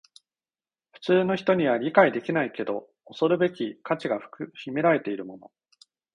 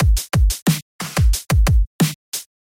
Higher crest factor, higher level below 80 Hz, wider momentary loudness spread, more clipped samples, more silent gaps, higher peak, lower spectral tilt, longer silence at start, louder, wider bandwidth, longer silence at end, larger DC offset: first, 22 dB vs 12 dB; second, -70 dBFS vs -20 dBFS; first, 15 LU vs 8 LU; neither; second, none vs 0.62-0.66 s, 0.82-0.99 s, 1.87-1.99 s, 2.15-2.32 s; about the same, -4 dBFS vs -4 dBFS; first, -7.5 dB/octave vs -5 dB/octave; first, 1 s vs 0 s; second, -25 LUFS vs -19 LUFS; second, 10 kHz vs 17 kHz; first, 0.75 s vs 0.25 s; neither